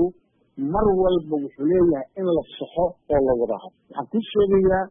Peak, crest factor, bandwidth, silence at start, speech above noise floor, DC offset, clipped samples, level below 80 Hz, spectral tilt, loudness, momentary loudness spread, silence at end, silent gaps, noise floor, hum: -8 dBFS; 14 dB; 3.8 kHz; 0 s; 19 dB; under 0.1%; under 0.1%; -42 dBFS; -12 dB/octave; -22 LUFS; 11 LU; 0 s; none; -41 dBFS; none